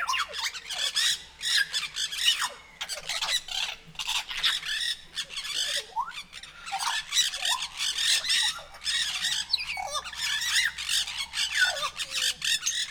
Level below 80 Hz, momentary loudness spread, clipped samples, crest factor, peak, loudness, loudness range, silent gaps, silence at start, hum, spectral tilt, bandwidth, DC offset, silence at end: -58 dBFS; 9 LU; under 0.1%; 20 dB; -10 dBFS; -27 LUFS; 3 LU; none; 0 s; none; 2.5 dB/octave; over 20 kHz; under 0.1%; 0 s